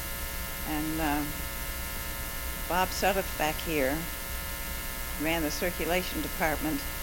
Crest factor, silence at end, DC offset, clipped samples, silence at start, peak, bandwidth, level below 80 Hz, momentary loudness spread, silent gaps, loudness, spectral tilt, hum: 20 dB; 0 s; under 0.1%; under 0.1%; 0 s; -10 dBFS; 17 kHz; -40 dBFS; 6 LU; none; -31 LUFS; -3.5 dB/octave; none